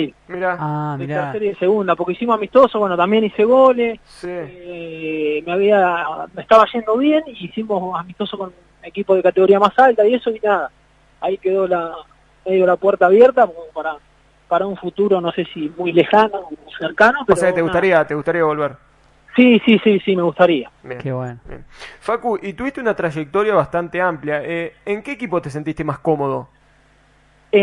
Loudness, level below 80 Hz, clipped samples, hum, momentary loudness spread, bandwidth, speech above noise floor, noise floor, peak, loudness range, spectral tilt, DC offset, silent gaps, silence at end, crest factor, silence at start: -17 LUFS; -52 dBFS; under 0.1%; 50 Hz at -55 dBFS; 16 LU; 11 kHz; 37 dB; -53 dBFS; 0 dBFS; 5 LU; -6.5 dB/octave; under 0.1%; none; 0 s; 18 dB; 0 s